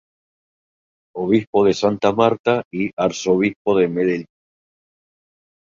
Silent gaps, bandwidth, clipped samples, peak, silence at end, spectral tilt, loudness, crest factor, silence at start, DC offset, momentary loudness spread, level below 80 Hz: 1.47-1.53 s, 2.39-2.44 s, 2.65-2.71 s, 2.93-2.97 s, 3.56-3.65 s; 7.6 kHz; under 0.1%; -2 dBFS; 1.35 s; -6 dB/octave; -19 LUFS; 18 dB; 1.15 s; under 0.1%; 8 LU; -58 dBFS